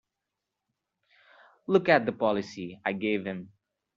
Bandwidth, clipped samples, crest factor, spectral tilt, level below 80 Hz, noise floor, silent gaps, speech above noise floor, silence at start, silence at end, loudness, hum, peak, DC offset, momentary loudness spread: 7.4 kHz; under 0.1%; 24 dB; -4 dB/octave; -70 dBFS; -86 dBFS; none; 59 dB; 1.7 s; 0.5 s; -28 LUFS; none; -6 dBFS; under 0.1%; 16 LU